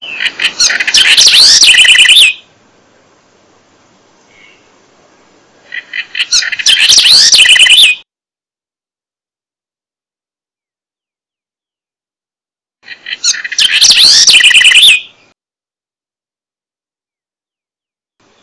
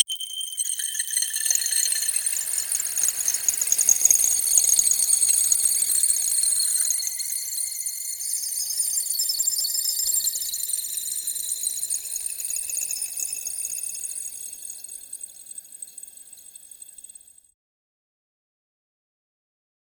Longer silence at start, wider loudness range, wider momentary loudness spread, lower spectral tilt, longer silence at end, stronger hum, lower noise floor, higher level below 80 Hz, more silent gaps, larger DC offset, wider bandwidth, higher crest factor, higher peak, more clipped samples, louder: about the same, 0 s vs 0 s; second, 12 LU vs 17 LU; second, 16 LU vs 19 LU; about the same, 3.5 dB/octave vs 4 dB/octave; first, 3.4 s vs 2.95 s; neither; first, under -90 dBFS vs -47 dBFS; first, -50 dBFS vs -66 dBFS; neither; neither; second, 11 kHz vs over 20 kHz; second, 10 dB vs 24 dB; about the same, 0 dBFS vs -2 dBFS; first, 3% vs under 0.1%; first, -3 LUFS vs -21 LUFS